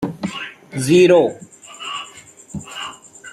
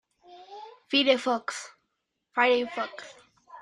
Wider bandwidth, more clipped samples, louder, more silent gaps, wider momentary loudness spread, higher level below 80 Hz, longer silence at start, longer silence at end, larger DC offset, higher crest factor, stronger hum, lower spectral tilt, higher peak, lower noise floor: about the same, 12.5 kHz vs 11.5 kHz; neither; first, -17 LUFS vs -26 LUFS; neither; about the same, 24 LU vs 23 LU; first, -56 dBFS vs -78 dBFS; second, 0 s vs 0.3 s; about the same, 0 s vs 0 s; neither; about the same, 18 dB vs 22 dB; neither; first, -5 dB/octave vs -2 dB/octave; first, -2 dBFS vs -8 dBFS; second, -42 dBFS vs -80 dBFS